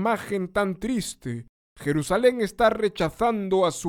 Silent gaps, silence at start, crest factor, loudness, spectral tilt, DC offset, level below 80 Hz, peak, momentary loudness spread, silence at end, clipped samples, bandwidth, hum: 1.49-1.76 s; 0 s; 16 dB; -25 LUFS; -5 dB/octave; under 0.1%; -48 dBFS; -8 dBFS; 11 LU; 0 s; under 0.1%; 17 kHz; none